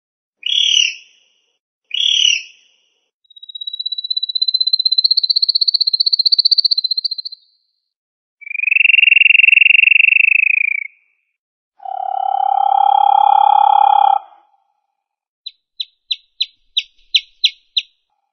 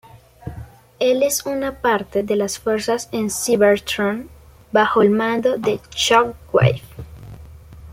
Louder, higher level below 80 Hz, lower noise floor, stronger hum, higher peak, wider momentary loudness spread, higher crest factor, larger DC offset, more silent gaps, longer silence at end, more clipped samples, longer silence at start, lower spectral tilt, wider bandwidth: first, -11 LUFS vs -19 LUFS; second, -74 dBFS vs -46 dBFS; first, -75 dBFS vs -40 dBFS; neither; about the same, 0 dBFS vs -2 dBFS; second, 17 LU vs 21 LU; about the same, 16 dB vs 18 dB; neither; first, 1.60-1.82 s, 3.13-3.20 s, 7.96-8.38 s, 11.38-11.72 s, 15.28-15.45 s vs none; first, 0.5 s vs 0 s; neither; first, 0.45 s vs 0.15 s; second, 12.5 dB/octave vs -4.5 dB/octave; second, 6.6 kHz vs 16.5 kHz